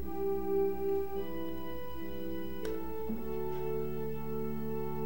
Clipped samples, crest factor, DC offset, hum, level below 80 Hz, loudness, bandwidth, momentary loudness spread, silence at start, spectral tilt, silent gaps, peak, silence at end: under 0.1%; 14 dB; 1%; none; -52 dBFS; -37 LUFS; 16.5 kHz; 8 LU; 0 s; -7.5 dB/octave; none; -22 dBFS; 0 s